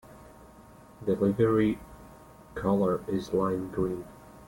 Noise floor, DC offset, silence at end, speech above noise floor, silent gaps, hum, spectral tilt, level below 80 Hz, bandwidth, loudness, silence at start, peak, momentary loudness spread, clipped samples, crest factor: -52 dBFS; under 0.1%; 0 s; 25 dB; none; none; -8 dB/octave; -54 dBFS; 17 kHz; -28 LUFS; 0.1 s; -12 dBFS; 15 LU; under 0.1%; 18 dB